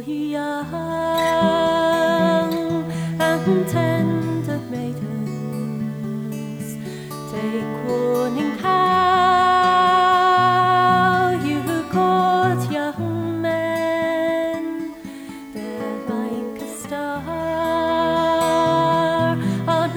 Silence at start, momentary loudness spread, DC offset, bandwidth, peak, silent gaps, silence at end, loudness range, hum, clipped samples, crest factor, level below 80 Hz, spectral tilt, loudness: 0 s; 13 LU; under 0.1%; over 20 kHz; -6 dBFS; none; 0 s; 10 LU; none; under 0.1%; 14 dB; -54 dBFS; -6 dB/octave; -20 LUFS